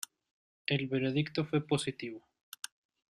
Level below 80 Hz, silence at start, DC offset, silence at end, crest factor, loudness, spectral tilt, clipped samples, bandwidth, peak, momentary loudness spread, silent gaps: -70 dBFS; 0.7 s; under 0.1%; 0.95 s; 22 dB; -34 LUFS; -5.5 dB/octave; under 0.1%; 15 kHz; -14 dBFS; 15 LU; none